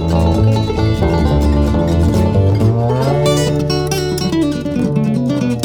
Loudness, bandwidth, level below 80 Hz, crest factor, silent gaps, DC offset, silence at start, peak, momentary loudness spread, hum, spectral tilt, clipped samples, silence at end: -14 LUFS; 19.5 kHz; -24 dBFS; 12 dB; none; under 0.1%; 0 s; -2 dBFS; 4 LU; none; -7 dB/octave; under 0.1%; 0 s